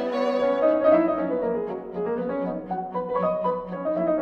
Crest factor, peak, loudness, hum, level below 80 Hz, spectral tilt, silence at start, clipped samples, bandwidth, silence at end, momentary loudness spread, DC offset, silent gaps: 16 dB; -8 dBFS; -25 LUFS; none; -58 dBFS; -8.5 dB/octave; 0 s; under 0.1%; 6.6 kHz; 0 s; 10 LU; under 0.1%; none